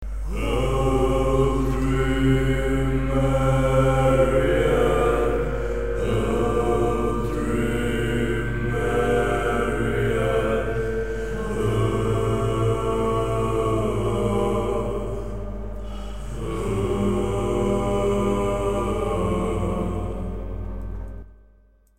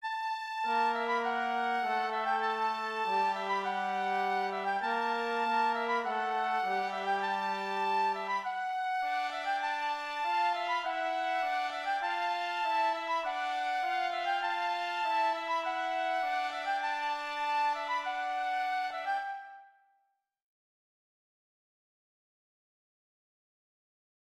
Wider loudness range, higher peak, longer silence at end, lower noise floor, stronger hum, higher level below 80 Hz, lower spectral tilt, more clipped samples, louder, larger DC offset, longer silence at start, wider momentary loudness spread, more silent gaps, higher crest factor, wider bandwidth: first, 6 LU vs 3 LU; first, -6 dBFS vs -18 dBFS; second, 0 s vs 4.55 s; second, -55 dBFS vs -77 dBFS; neither; first, -30 dBFS vs -80 dBFS; first, -7 dB/octave vs -2.5 dB/octave; neither; first, -23 LUFS vs -32 LUFS; first, 1% vs under 0.1%; about the same, 0 s vs 0 s; first, 12 LU vs 4 LU; neither; about the same, 16 dB vs 16 dB; about the same, 15 kHz vs 14 kHz